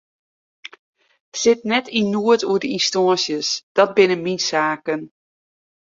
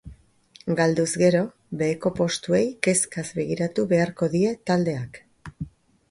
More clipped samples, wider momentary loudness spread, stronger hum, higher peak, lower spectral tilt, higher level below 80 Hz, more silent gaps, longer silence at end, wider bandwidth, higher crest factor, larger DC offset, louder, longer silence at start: neither; second, 11 LU vs 17 LU; neither; about the same, -2 dBFS vs -4 dBFS; second, -3.5 dB/octave vs -5 dB/octave; second, -64 dBFS vs -54 dBFS; first, 0.79-0.93 s, 1.20-1.32 s, 3.63-3.75 s vs none; first, 0.8 s vs 0.4 s; second, 7.8 kHz vs 11.5 kHz; about the same, 18 dB vs 20 dB; neither; first, -19 LUFS vs -23 LUFS; first, 0.65 s vs 0.05 s